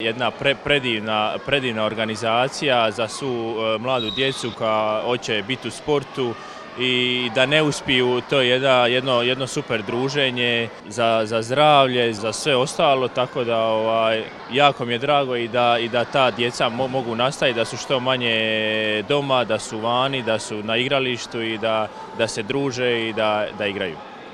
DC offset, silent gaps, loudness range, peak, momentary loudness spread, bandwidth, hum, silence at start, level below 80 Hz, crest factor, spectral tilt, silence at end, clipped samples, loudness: under 0.1%; none; 4 LU; 0 dBFS; 7 LU; 12.5 kHz; none; 0 s; -56 dBFS; 20 dB; -4 dB/octave; 0 s; under 0.1%; -20 LUFS